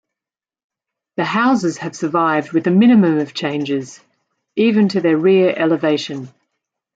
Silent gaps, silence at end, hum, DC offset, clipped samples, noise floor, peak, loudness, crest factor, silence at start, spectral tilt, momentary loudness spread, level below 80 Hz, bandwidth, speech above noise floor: none; 0.7 s; none; under 0.1%; under 0.1%; -90 dBFS; -4 dBFS; -16 LUFS; 14 dB; 1.2 s; -6.5 dB/octave; 12 LU; -66 dBFS; 8 kHz; 74 dB